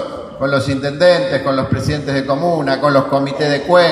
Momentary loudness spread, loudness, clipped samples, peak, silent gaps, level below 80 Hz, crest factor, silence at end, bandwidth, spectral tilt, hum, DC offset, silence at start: 6 LU; -15 LUFS; under 0.1%; 0 dBFS; none; -42 dBFS; 14 dB; 0 s; 12.5 kHz; -6 dB/octave; none; under 0.1%; 0 s